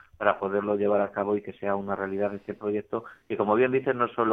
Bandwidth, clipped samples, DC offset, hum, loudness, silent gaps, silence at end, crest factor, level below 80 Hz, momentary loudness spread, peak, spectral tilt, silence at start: 3.9 kHz; under 0.1%; under 0.1%; none; -27 LUFS; none; 0 s; 20 dB; -66 dBFS; 8 LU; -6 dBFS; -9 dB/octave; 0.2 s